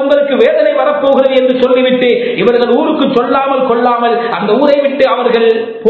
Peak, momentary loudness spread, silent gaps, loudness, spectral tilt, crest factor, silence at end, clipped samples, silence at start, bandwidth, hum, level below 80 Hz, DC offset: 0 dBFS; 3 LU; none; -10 LUFS; -7 dB/octave; 10 dB; 0 s; 0.3%; 0 s; 5.4 kHz; none; -54 dBFS; under 0.1%